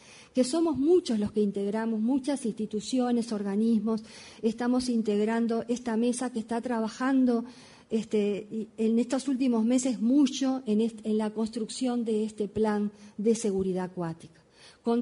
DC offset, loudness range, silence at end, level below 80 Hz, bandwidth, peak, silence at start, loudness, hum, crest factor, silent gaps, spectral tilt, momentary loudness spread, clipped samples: under 0.1%; 2 LU; 0 s; -64 dBFS; 11 kHz; -14 dBFS; 0.1 s; -28 LUFS; none; 14 dB; none; -5.5 dB/octave; 8 LU; under 0.1%